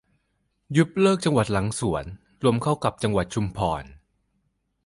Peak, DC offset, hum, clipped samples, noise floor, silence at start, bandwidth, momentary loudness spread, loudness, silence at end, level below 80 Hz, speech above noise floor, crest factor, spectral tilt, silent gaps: -6 dBFS; under 0.1%; none; under 0.1%; -72 dBFS; 0.7 s; 11.5 kHz; 8 LU; -24 LUFS; 0.9 s; -46 dBFS; 49 dB; 20 dB; -6 dB/octave; none